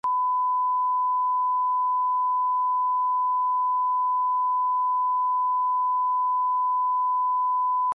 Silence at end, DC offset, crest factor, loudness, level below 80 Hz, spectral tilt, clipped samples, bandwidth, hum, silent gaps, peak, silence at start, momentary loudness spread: 0 s; under 0.1%; 4 dB; -23 LUFS; -86 dBFS; -3.5 dB/octave; under 0.1%; 1.6 kHz; 50 Hz at -105 dBFS; none; -20 dBFS; 0.05 s; 0 LU